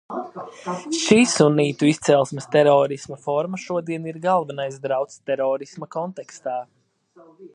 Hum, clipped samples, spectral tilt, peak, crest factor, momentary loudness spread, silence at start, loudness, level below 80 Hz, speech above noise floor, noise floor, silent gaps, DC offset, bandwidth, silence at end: none; under 0.1%; -5 dB/octave; 0 dBFS; 20 dB; 15 LU; 0.1 s; -21 LUFS; -64 dBFS; 32 dB; -53 dBFS; none; under 0.1%; 11 kHz; 0.05 s